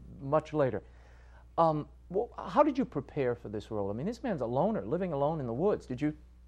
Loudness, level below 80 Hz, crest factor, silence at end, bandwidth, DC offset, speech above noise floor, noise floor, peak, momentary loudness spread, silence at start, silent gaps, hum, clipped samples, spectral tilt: -32 LUFS; -54 dBFS; 20 dB; 0 s; 9.4 kHz; under 0.1%; 23 dB; -54 dBFS; -12 dBFS; 8 LU; 0 s; none; none; under 0.1%; -8.5 dB/octave